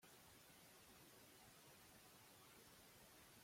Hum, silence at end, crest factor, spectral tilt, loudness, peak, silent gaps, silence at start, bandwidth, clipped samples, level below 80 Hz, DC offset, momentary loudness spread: none; 0 s; 12 dB; -2.5 dB/octave; -65 LUFS; -54 dBFS; none; 0 s; 16.5 kHz; under 0.1%; -86 dBFS; under 0.1%; 0 LU